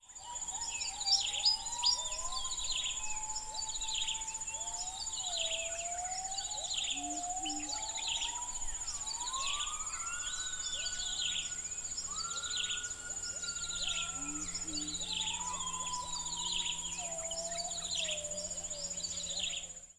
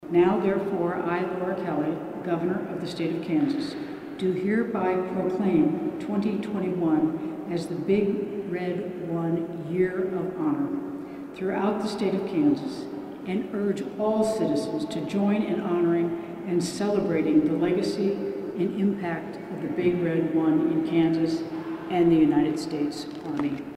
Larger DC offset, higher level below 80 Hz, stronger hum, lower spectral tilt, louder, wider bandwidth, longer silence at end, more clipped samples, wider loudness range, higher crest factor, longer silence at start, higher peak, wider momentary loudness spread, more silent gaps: neither; first, -54 dBFS vs -60 dBFS; neither; second, 0.5 dB/octave vs -7 dB/octave; second, -35 LUFS vs -26 LUFS; second, 11 kHz vs 12.5 kHz; about the same, 0.05 s vs 0 s; neither; about the same, 4 LU vs 4 LU; about the same, 20 dB vs 16 dB; about the same, 0 s vs 0 s; second, -18 dBFS vs -10 dBFS; about the same, 7 LU vs 9 LU; neither